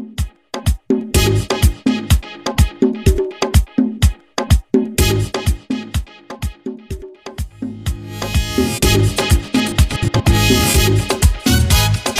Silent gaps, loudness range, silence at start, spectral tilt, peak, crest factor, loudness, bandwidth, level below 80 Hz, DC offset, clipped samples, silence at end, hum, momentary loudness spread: none; 7 LU; 0 s; -5 dB/octave; 0 dBFS; 16 dB; -16 LUFS; 16 kHz; -20 dBFS; under 0.1%; under 0.1%; 0 s; none; 14 LU